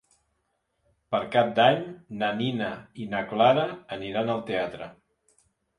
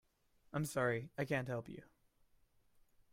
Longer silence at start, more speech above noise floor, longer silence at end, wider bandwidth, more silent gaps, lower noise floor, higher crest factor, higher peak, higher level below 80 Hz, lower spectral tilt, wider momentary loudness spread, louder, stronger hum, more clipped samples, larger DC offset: first, 1.1 s vs 0.55 s; first, 50 dB vs 33 dB; second, 0.85 s vs 1.3 s; second, 11 kHz vs 16 kHz; neither; about the same, -76 dBFS vs -73 dBFS; about the same, 20 dB vs 20 dB; first, -6 dBFS vs -24 dBFS; first, -64 dBFS vs -72 dBFS; about the same, -6.5 dB/octave vs -6 dB/octave; about the same, 15 LU vs 13 LU; first, -26 LUFS vs -40 LUFS; neither; neither; neither